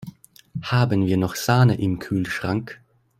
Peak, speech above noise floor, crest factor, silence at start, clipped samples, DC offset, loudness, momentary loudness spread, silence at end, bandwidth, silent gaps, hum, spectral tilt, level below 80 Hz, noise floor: -4 dBFS; 23 dB; 18 dB; 0 s; under 0.1%; under 0.1%; -22 LUFS; 17 LU; 0.45 s; 16 kHz; none; none; -6.5 dB/octave; -52 dBFS; -44 dBFS